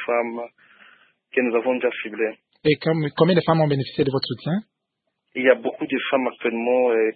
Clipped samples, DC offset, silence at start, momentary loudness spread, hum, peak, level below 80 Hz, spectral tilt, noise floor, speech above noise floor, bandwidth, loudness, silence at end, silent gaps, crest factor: under 0.1%; under 0.1%; 0 s; 9 LU; none; -2 dBFS; -62 dBFS; -11 dB/octave; -78 dBFS; 57 dB; 4.8 kHz; -22 LUFS; 0.05 s; none; 20 dB